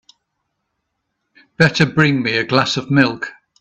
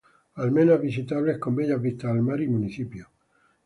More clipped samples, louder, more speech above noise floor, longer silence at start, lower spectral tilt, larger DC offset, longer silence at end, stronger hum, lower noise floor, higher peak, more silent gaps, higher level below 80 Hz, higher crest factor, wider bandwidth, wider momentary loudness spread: neither; first, -15 LUFS vs -25 LUFS; first, 58 dB vs 42 dB; first, 1.6 s vs 0.35 s; second, -5.5 dB/octave vs -9.5 dB/octave; neither; second, 0.3 s vs 0.6 s; neither; first, -74 dBFS vs -66 dBFS; first, 0 dBFS vs -8 dBFS; neither; first, -52 dBFS vs -60 dBFS; about the same, 18 dB vs 18 dB; second, 8.4 kHz vs 11 kHz; second, 5 LU vs 15 LU